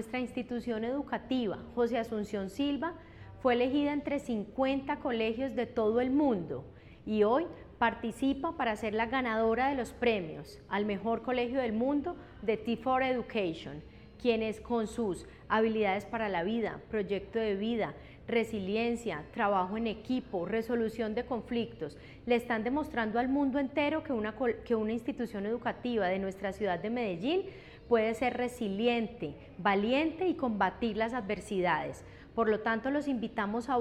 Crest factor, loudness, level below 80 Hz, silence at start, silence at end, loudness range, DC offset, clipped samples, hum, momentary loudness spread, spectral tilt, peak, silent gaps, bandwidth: 18 dB; -32 LUFS; -58 dBFS; 0 s; 0 s; 2 LU; under 0.1%; under 0.1%; none; 7 LU; -6 dB/octave; -14 dBFS; none; 13.5 kHz